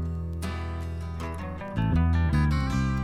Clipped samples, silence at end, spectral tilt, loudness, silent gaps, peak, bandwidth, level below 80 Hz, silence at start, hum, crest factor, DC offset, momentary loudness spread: under 0.1%; 0 s; -7.5 dB/octave; -28 LUFS; none; -14 dBFS; 12.5 kHz; -32 dBFS; 0 s; none; 14 dB; under 0.1%; 10 LU